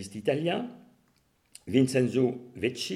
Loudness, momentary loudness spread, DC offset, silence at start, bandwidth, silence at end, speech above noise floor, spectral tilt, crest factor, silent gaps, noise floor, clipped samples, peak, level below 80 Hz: -28 LUFS; 10 LU; under 0.1%; 0 s; 14 kHz; 0 s; 41 dB; -6 dB/octave; 20 dB; none; -69 dBFS; under 0.1%; -10 dBFS; -68 dBFS